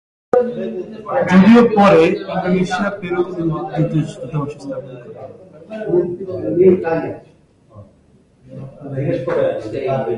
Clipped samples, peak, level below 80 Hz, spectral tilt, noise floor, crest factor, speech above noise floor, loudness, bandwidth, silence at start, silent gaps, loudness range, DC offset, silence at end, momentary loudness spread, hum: under 0.1%; 0 dBFS; -50 dBFS; -8 dB/octave; -52 dBFS; 16 dB; 35 dB; -16 LUFS; 10 kHz; 0.35 s; none; 9 LU; under 0.1%; 0 s; 23 LU; none